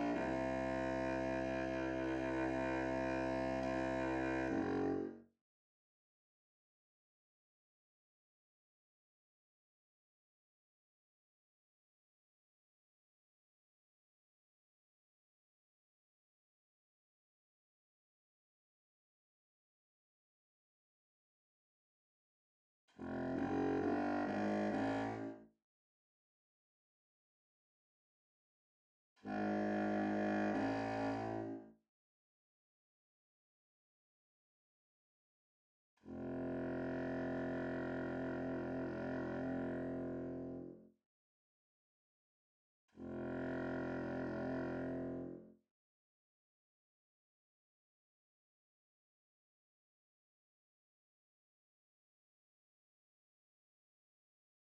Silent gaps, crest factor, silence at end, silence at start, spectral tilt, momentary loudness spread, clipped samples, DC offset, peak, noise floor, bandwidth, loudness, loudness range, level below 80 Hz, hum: 5.41-22.88 s, 25.64-29.16 s, 31.89-35.97 s, 41.06-42.88 s; 18 dB; 9.15 s; 0 s; -7.5 dB/octave; 9 LU; under 0.1%; under 0.1%; -26 dBFS; under -90 dBFS; 8.8 kHz; -41 LUFS; 12 LU; -66 dBFS; none